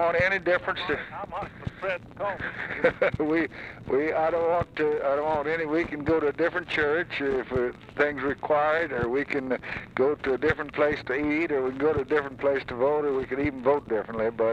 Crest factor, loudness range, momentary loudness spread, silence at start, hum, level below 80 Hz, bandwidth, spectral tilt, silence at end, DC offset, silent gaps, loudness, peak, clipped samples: 18 dB; 2 LU; 7 LU; 0 s; none; -52 dBFS; 8.6 kHz; -7 dB/octave; 0 s; under 0.1%; none; -27 LUFS; -8 dBFS; under 0.1%